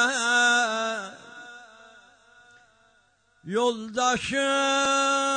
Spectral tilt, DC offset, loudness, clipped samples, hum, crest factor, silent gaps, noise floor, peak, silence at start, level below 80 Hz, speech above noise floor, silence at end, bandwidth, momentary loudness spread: -1.5 dB/octave; under 0.1%; -23 LUFS; under 0.1%; none; 16 dB; none; -64 dBFS; -10 dBFS; 0 s; -64 dBFS; 40 dB; 0 s; 9.6 kHz; 22 LU